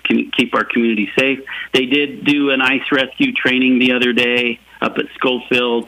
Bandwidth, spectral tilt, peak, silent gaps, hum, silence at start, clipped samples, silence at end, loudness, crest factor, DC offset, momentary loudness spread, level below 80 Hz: 14.5 kHz; -4.5 dB/octave; -2 dBFS; none; none; 0.05 s; under 0.1%; 0 s; -15 LUFS; 14 dB; under 0.1%; 7 LU; -58 dBFS